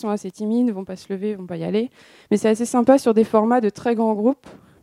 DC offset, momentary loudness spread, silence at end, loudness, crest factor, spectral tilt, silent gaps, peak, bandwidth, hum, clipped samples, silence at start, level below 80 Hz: under 0.1%; 12 LU; 0.3 s; -20 LUFS; 18 dB; -6.5 dB/octave; none; -2 dBFS; 13 kHz; none; under 0.1%; 0.05 s; -66 dBFS